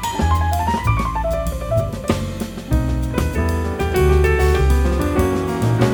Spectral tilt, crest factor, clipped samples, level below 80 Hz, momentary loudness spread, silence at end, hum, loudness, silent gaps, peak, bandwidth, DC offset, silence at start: -6.5 dB/octave; 16 dB; under 0.1%; -22 dBFS; 6 LU; 0 s; none; -19 LUFS; none; 0 dBFS; over 20 kHz; under 0.1%; 0 s